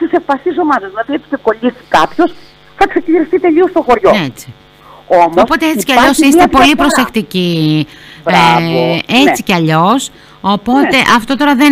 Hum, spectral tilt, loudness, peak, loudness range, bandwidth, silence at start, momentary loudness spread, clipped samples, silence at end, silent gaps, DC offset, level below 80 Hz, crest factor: none; -4.5 dB/octave; -10 LUFS; 0 dBFS; 4 LU; 16 kHz; 0 s; 8 LU; under 0.1%; 0 s; none; under 0.1%; -38 dBFS; 10 dB